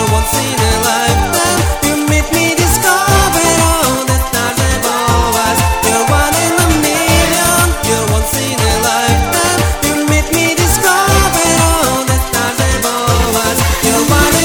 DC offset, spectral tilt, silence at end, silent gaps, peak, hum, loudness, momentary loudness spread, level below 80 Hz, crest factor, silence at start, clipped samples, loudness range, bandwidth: under 0.1%; -3.5 dB/octave; 0 s; none; 0 dBFS; none; -11 LUFS; 4 LU; -20 dBFS; 12 dB; 0 s; under 0.1%; 1 LU; over 20 kHz